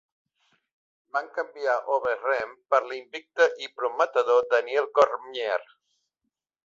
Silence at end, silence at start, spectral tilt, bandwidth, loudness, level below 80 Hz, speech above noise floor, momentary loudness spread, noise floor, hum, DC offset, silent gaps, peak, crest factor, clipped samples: 1 s; 1.15 s; -2 dB/octave; 7.6 kHz; -26 LUFS; -74 dBFS; 58 dB; 10 LU; -83 dBFS; none; under 0.1%; none; -6 dBFS; 20 dB; under 0.1%